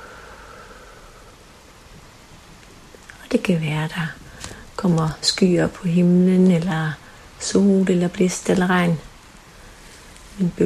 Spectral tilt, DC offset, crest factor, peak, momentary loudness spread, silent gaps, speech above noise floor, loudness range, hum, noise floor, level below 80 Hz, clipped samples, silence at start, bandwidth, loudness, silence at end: -6 dB/octave; under 0.1%; 18 dB; -4 dBFS; 24 LU; none; 28 dB; 9 LU; none; -46 dBFS; -48 dBFS; under 0.1%; 0 s; 13 kHz; -19 LUFS; 0 s